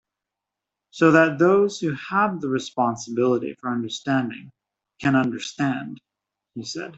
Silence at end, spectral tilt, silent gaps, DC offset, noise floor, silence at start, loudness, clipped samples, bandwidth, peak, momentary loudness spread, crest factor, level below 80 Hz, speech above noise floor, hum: 0 s; -5.5 dB/octave; none; under 0.1%; -86 dBFS; 0.95 s; -22 LUFS; under 0.1%; 8.2 kHz; -4 dBFS; 15 LU; 20 dB; -66 dBFS; 64 dB; none